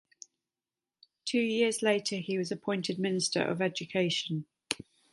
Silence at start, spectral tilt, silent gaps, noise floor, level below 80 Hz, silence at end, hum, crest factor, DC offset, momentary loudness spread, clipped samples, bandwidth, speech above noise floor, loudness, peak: 1.25 s; -4 dB/octave; none; under -90 dBFS; -76 dBFS; 0.35 s; none; 24 dB; under 0.1%; 10 LU; under 0.1%; 11.5 kHz; over 59 dB; -31 LUFS; -8 dBFS